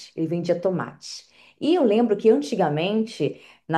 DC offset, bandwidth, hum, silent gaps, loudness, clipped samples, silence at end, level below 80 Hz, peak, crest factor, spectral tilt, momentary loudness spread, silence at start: under 0.1%; 11.5 kHz; none; none; -22 LUFS; under 0.1%; 0 s; -72 dBFS; -6 dBFS; 16 dB; -6.5 dB/octave; 17 LU; 0 s